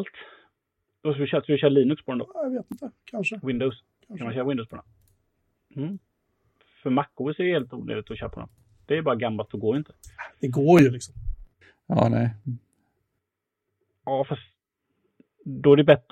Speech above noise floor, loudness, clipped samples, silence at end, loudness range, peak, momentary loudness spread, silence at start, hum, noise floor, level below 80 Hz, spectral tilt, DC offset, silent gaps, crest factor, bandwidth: 59 dB; -24 LUFS; under 0.1%; 0.15 s; 8 LU; -2 dBFS; 23 LU; 0 s; none; -83 dBFS; -48 dBFS; -7.5 dB/octave; under 0.1%; none; 24 dB; 14 kHz